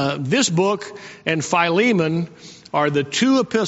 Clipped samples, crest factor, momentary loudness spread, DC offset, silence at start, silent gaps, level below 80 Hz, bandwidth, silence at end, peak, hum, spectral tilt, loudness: under 0.1%; 18 dB; 10 LU; under 0.1%; 0 s; none; -62 dBFS; 8 kHz; 0 s; -2 dBFS; none; -4 dB/octave; -19 LUFS